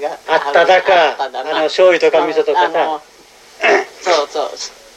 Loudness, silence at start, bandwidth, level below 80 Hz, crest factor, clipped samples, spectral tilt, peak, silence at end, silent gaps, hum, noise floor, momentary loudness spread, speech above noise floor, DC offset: -14 LUFS; 0 s; 13.5 kHz; -60 dBFS; 14 dB; under 0.1%; -2 dB/octave; 0 dBFS; 0.25 s; none; none; -41 dBFS; 11 LU; 28 dB; under 0.1%